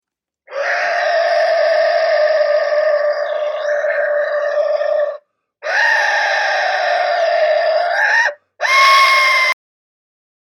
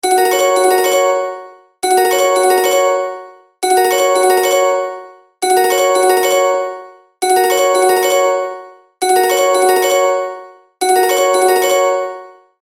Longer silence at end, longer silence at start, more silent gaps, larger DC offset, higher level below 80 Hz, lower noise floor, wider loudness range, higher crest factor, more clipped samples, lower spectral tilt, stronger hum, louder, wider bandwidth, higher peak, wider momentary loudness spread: first, 0.95 s vs 0.35 s; first, 0.5 s vs 0.05 s; neither; neither; second, -80 dBFS vs -66 dBFS; first, -48 dBFS vs -34 dBFS; first, 4 LU vs 1 LU; about the same, 16 dB vs 14 dB; neither; second, 2.5 dB/octave vs -0.5 dB/octave; neither; about the same, -14 LUFS vs -13 LUFS; about the same, 18 kHz vs 16.5 kHz; about the same, 0 dBFS vs 0 dBFS; second, 9 LU vs 13 LU